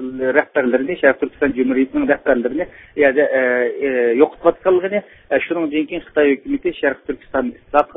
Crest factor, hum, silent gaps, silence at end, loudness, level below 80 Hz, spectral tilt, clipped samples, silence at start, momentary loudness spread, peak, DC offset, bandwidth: 18 dB; none; none; 0.1 s; -18 LUFS; -50 dBFS; -8.5 dB/octave; under 0.1%; 0 s; 8 LU; 0 dBFS; under 0.1%; 3.9 kHz